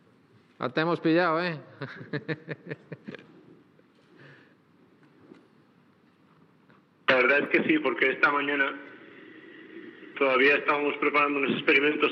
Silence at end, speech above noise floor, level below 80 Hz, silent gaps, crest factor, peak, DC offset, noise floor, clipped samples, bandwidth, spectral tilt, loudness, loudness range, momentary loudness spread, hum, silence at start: 0 s; 35 dB; under -90 dBFS; none; 20 dB; -8 dBFS; under 0.1%; -61 dBFS; under 0.1%; 6.6 kHz; -7 dB/octave; -25 LUFS; 16 LU; 22 LU; none; 0.6 s